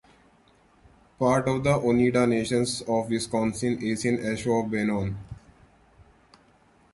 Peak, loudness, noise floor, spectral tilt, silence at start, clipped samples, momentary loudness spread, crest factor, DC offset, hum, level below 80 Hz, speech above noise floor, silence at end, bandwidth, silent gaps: -10 dBFS; -25 LUFS; -60 dBFS; -5.5 dB/octave; 1.2 s; under 0.1%; 7 LU; 18 dB; under 0.1%; none; -52 dBFS; 35 dB; 1.6 s; 11.5 kHz; none